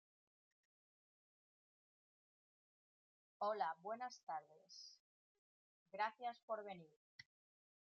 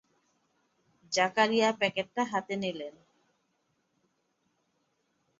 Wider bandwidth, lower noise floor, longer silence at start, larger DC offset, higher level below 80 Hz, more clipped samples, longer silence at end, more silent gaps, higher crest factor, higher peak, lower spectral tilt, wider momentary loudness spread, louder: second, 7.2 kHz vs 8 kHz; first, under -90 dBFS vs -76 dBFS; first, 3.4 s vs 1.1 s; neither; second, under -90 dBFS vs -78 dBFS; neither; second, 0.65 s vs 2.5 s; first, 4.23-4.27 s, 5.00-5.86 s, 6.43-6.48 s, 6.96-7.19 s vs none; about the same, 24 dB vs 22 dB; second, -30 dBFS vs -10 dBFS; second, -1 dB/octave vs -3.5 dB/octave; first, 21 LU vs 11 LU; second, -48 LUFS vs -29 LUFS